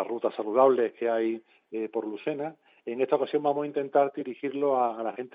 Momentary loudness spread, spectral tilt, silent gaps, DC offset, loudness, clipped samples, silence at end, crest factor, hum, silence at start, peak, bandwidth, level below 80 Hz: 13 LU; -9 dB/octave; none; under 0.1%; -28 LUFS; under 0.1%; 0.05 s; 20 dB; none; 0 s; -8 dBFS; 4.9 kHz; under -90 dBFS